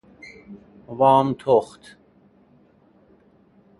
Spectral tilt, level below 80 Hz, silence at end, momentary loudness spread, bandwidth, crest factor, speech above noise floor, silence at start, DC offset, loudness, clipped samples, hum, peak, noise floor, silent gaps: -7.5 dB/octave; -62 dBFS; 2.15 s; 27 LU; 11.5 kHz; 20 dB; 37 dB; 0.5 s; under 0.1%; -19 LUFS; under 0.1%; none; -4 dBFS; -56 dBFS; none